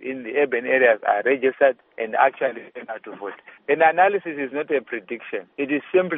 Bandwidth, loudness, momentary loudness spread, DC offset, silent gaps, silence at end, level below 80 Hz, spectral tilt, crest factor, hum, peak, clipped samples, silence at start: 3.8 kHz; -21 LUFS; 17 LU; under 0.1%; none; 0 s; -74 dBFS; -2.5 dB/octave; 18 dB; none; -4 dBFS; under 0.1%; 0 s